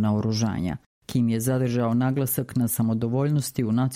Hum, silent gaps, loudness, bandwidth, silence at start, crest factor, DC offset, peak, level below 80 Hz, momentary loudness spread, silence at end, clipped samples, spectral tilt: none; 0.86-1.02 s; -25 LUFS; 16 kHz; 0 s; 14 dB; under 0.1%; -10 dBFS; -52 dBFS; 5 LU; 0 s; under 0.1%; -6.5 dB/octave